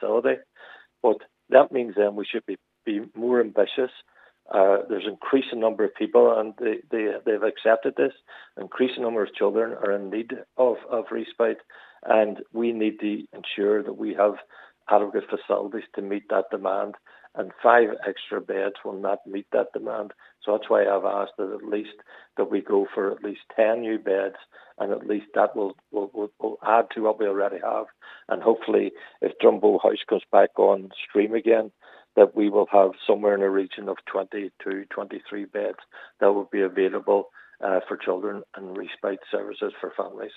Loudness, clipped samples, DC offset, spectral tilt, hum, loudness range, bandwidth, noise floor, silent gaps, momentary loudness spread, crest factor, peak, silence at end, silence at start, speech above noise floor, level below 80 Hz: -24 LUFS; under 0.1%; under 0.1%; -7.5 dB/octave; none; 5 LU; 4.1 kHz; -49 dBFS; none; 13 LU; 24 dB; -2 dBFS; 0.1 s; 0 s; 25 dB; -86 dBFS